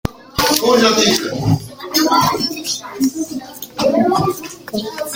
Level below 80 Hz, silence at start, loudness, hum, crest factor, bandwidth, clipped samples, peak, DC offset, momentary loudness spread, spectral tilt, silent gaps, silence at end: -42 dBFS; 0.05 s; -16 LUFS; none; 16 dB; 17 kHz; under 0.1%; 0 dBFS; under 0.1%; 13 LU; -4 dB/octave; none; 0 s